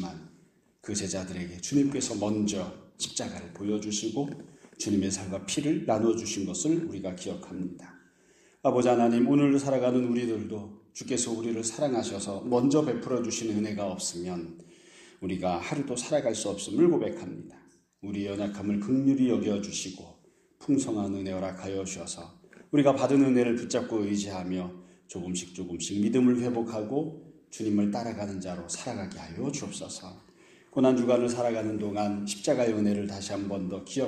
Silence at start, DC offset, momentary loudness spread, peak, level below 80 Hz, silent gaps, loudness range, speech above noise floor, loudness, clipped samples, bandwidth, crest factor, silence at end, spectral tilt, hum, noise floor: 0 s; under 0.1%; 15 LU; -10 dBFS; -64 dBFS; none; 5 LU; 33 dB; -29 LUFS; under 0.1%; 12.5 kHz; 20 dB; 0 s; -5 dB/octave; none; -62 dBFS